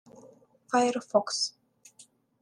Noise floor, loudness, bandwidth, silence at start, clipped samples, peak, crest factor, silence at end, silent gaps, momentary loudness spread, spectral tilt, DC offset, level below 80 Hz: -59 dBFS; -28 LUFS; 12 kHz; 0.25 s; under 0.1%; -10 dBFS; 20 dB; 0.4 s; none; 4 LU; -2.5 dB/octave; under 0.1%; -82 dBFS